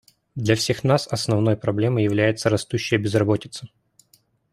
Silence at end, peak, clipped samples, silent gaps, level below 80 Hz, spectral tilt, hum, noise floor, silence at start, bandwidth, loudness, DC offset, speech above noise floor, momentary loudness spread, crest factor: 0.85 s; -4 dBFS; under 0.1%; none; -56 dBFS; -5.5 dB/octave; none; -61 dBFS; 0.35 s; 15 kHz; -21 LUFS; under 0.1%; 40 dB; 7 LU; 18 dB